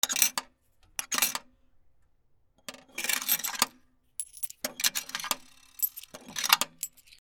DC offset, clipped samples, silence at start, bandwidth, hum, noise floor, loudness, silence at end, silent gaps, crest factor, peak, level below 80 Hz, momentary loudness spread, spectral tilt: under 0.1%; under 0.1%; 0.05 s; over 20 kHz; none; -65 dBFS; -29 LUFS; 0.05 s; none; 32 dB; 0 dBFS; -70 dBFS; 15 LU; 1.5 dB/octave